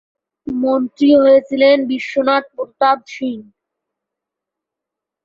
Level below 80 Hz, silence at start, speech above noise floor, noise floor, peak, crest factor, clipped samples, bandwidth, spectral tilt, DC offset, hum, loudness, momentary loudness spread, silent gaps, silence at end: -60 dBFS; 0.45 s; 69 dB; -84 dBFS; -2 dBFS; 16 dB; under 0.1%; 7.2 kHz; -5 dB/octave; under 0.1%; none; -15 LUFS; 14 LU; none; 1.85 s